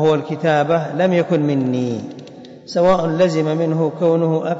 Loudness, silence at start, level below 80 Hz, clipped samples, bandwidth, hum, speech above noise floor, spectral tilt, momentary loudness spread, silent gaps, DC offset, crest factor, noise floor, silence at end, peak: -17 LUFS; 0 s; -52 dBFS; under 0.1%; 7.8 kHz; none; 21 dB; -7.5 dB/octave; 12 LU; none; under 0.1%; 12 dB; -37 dBFS; 0 s; -6 dBFS